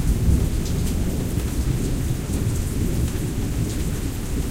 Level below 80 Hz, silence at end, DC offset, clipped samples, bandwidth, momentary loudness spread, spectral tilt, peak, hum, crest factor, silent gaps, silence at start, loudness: -26 dBFS; 0 s; under 0.1%; under 0.1%; 16 kHz; 5 LU; -6 dB/octave; -8 dBFS; none; 14 dB; none; 0 s; -24 LUFS